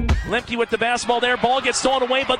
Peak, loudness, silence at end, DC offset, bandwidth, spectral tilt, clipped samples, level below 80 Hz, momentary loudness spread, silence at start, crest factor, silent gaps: -4 dBFS; -20 LUFS; 0 s; under 0.1%; 10.5 kHz; -3.5 dB/octave; under 0.1%; -30 dBFS; 4 LU; 0 s; 16 dB; none